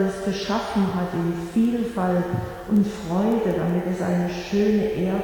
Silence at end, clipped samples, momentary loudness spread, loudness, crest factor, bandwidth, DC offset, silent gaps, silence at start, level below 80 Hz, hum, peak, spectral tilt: 0 s; under 0.1%; 4 LU; -23 LUFS; 12 dB; 18.5 kHz; under 0.1%; none; 0 s; -46 dBFS; none; -10 dBFS; -7 dB/octave